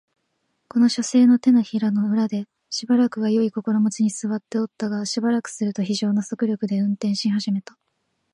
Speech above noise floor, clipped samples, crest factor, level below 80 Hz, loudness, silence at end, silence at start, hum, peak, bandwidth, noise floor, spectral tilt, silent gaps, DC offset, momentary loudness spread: 52 dB; under 0.1%; 14 dB; -74 dBFS; -22 LUFS; 0.75 s; 0.75 s; none; -8 dBFS; 11 kHz; -73 dBFS; -5.5 dB/octave; none; under 0.1%; 10 LU